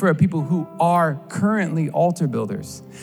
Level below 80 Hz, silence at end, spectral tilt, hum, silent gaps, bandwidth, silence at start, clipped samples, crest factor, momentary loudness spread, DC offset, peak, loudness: -64 dBFS; 0 s; -7.5 dB/octave; none; none; 13 kHz; 0 s; under 0.1%; 16 dB; 9 LU; under 0.1%; -6 dBFS; -21 LUFS